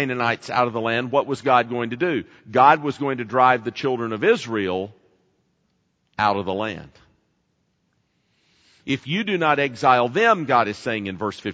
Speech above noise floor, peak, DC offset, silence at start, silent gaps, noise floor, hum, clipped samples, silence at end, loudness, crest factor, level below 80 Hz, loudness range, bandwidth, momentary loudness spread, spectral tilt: 48 dB; 0 dBFS; under 0.1%; 0 s; none; -69 dBFS; none; under 0.1%; 0 s; -21 LUFS; 22 dB; -64 dBFS; 9 LU; 9.2 kHz; 11 LU; -5.5 dB/octave